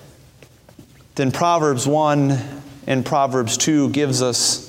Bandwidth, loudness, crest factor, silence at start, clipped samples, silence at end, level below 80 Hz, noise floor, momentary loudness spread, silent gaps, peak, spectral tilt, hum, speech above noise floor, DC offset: 16.5 kHz; -18 LUFS; 16 dB; 0.8 s; under 0.1%; 0 s; -56 dBFS; -48 dBFS; 7 LU; none; -4 dBFS; -4 dB/octave; none; 30 dB; under 0.1%